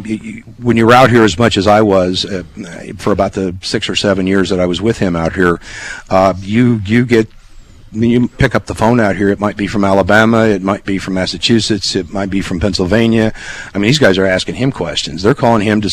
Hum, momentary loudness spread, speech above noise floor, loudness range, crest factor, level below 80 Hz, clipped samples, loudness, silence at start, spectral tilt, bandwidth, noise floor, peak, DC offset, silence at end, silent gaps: none; 11 LU; 24 dB; 3 LU; 12 dB; -34 dBFS; 0.2%; -12 LUFS; 0 s; -5.5 dB/octave; 14.5 kHz; -36 dBFS; 0 dBFS; under 0.1%; 0 s; none